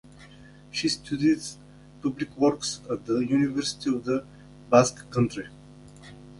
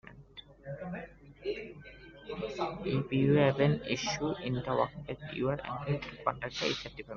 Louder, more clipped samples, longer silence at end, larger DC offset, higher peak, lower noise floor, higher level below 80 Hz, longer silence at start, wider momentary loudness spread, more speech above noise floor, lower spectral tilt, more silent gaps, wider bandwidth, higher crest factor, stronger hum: first, -26 LUFS vs -33 LUFS; neither; about the same, 0 s vs 0 s; neither; first, -4 dBFS vs -12 dBFS; second, -49 dBFS vs -53 dBFS; about the same, -56 dBFS vs -58 dBFS; first, 0.2 s vs 0.05 s; second, 17 LU vs 22 LU; about the same, 24 dB vs 22 dB; about the same, -5 dB/octave vs -5 dB/octave; neither; first, 11.5 kHz vs 7.2 kHz; about the same, 22 dB vs 22 dB; first, 50 Hz at -50 dBFS vs none